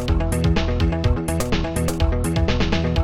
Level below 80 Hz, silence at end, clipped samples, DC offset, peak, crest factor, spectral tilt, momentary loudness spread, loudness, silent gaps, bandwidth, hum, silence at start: -24 dBFS; 0 s; under 0.1%; under 0.1%; -6 dBFS; 14 dB; -6 dB/octave; 2 LU; -21 LUFS; none; 16 kHz; none; 0 s